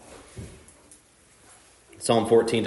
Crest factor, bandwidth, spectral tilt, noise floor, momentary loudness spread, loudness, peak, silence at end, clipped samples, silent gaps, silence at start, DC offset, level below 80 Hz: 20 dB; 11.5 kHz; -5 dB/octave; -57 dBFS; 24 LU; -22 LUFS; -6 dBFS; 0 s; under 0.1%; none; 0.1 s; under 0.1%; -58 dBFS